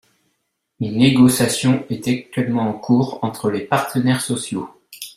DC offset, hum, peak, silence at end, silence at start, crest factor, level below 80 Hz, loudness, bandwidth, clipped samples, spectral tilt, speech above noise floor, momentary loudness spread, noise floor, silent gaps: under 0.1%; none; -2 dBFS; 0.05 s; 0.8 s; 16 dB; -54 dBFS; -18 LUFS; 16 kHz; under 0.1%; -5.5 dB/octave; 54 dB; 13 LU; -72 dBFS; none